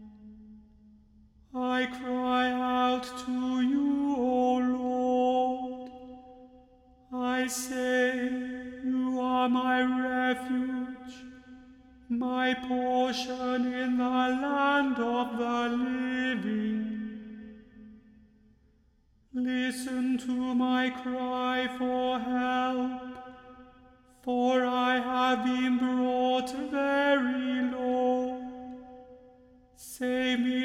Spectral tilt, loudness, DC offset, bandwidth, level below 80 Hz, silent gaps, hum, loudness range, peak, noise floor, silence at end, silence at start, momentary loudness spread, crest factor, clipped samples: -4 dB/octave; -29 LUFS; under 0.1%; 13.5 kHz; -64 dBFS; none; none; 5 LU; -14 dBFS; -65 dBFS; 0 s; 0 s; 15 LU; 16 dB; under 0.1%